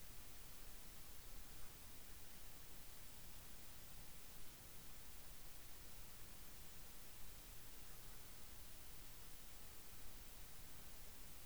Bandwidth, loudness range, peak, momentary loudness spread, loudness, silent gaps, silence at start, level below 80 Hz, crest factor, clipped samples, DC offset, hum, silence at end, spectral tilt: over 20 kHz; 0 LU; -40 dBFS; 0 LU; -56 LUFS; none; 0 s; -64 dBFS; 14 dB; under 0.1%; 0.2%; none; 0 s; -2.5 dB/octave